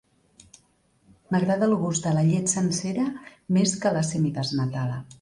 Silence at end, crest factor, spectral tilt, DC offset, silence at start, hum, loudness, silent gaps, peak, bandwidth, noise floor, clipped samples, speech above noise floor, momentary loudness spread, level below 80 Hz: 0.05 s; 16 dB; -5.5 dB/octave; under 0.1%; 1.3 s; none; -25 LUFS; none; -10 dBFS; 11.5 kHz; -64 dBFS; under 0.1%; 40 dB; 7 LU; -60 dBFS